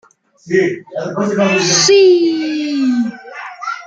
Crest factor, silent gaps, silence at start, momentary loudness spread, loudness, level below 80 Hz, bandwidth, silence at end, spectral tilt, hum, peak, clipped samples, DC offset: 14 dB; none; 0.45 s; 16 LU; -13 LUFS; -62 dBFS; 9.2 kHz; 0 s; -3.5 dB/octave; none; 0 dBFS; under 0.1%; under 0.1%